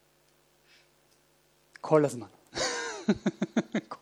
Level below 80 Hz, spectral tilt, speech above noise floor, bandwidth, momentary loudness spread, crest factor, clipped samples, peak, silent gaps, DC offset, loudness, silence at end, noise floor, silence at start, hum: -66 dBFS; -5 dB/octave; 38 dB; 13.5 kHz; 14 LU; 22 dB; under 0.1%; -10 dBFS; none; under 0.1%; -30 LUFS; 0.05 s; -66 dBFS; 1.85 s; none